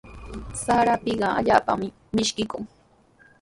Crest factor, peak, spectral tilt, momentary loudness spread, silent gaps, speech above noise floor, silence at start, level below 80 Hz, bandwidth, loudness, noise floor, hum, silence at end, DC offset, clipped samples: 22 dB; -2 dBFS; -4 dB/octave; 17 LU; none; 34 dB; 0.05 s; -46 dBFS; 11.5 kHz; -23 LUFS; -57 dBFS; none; 0.75 s; under 0.1%; under 0.1%